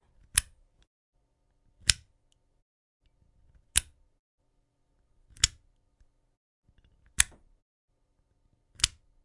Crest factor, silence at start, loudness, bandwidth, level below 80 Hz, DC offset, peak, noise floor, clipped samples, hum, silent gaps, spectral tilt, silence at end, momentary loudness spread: 36 dB; 0.35 s; -28 LUFS; 11.5 kHz; -50 dBFS; under 0.1%; 0 dBFS; -73 dBFS; under 0.1%; none; 0.87-1.13 s, 2.62-3.00 s, 4.19-4.38 s, 6.37-6.63 s, 7.62-7.88 s; 1 dB/octave; 0.4 s; 3 LU